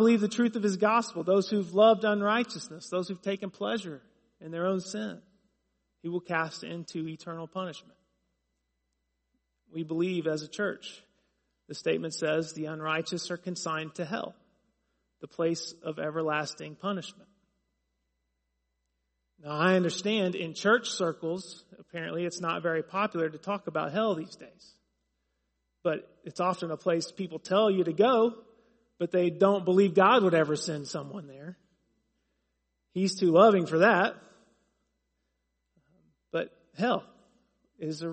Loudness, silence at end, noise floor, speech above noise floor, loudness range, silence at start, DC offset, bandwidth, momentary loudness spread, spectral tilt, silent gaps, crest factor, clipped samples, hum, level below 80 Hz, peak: -29 LUFS; 0 s; -80 dBFS; 51 dB; 11 LU; 0 s; under 0.1%; 8.4 kHz; 17 LU; -5 dB/octave; none; 24 dB; under 0.1%; none; -76 dBFS; -6 dBFS